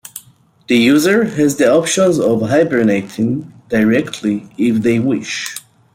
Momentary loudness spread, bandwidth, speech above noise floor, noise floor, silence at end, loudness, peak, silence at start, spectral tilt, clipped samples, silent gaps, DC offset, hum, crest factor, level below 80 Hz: 11 LU; 16.5 kHz; 34 dB; -47 dBFS; 0.35 s; -14 LUFS; -2 dBFS; 0.15 s; -5 dB/octave; under 0.1%; none; under 0.1%; none; 14 dB; -54 dBFS